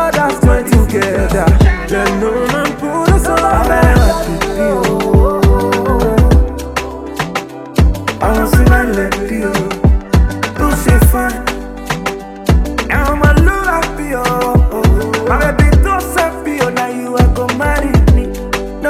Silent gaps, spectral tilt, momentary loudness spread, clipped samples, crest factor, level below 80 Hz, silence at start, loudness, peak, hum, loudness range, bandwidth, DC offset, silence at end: none; -6 dB/octave; 9 LU; under 0.1%; 12 dB; -16 dBFS; 0 s; -13 LUFS; 0 dBFS; none; 2 LU; 16 kHz; under 0.1%; 0 s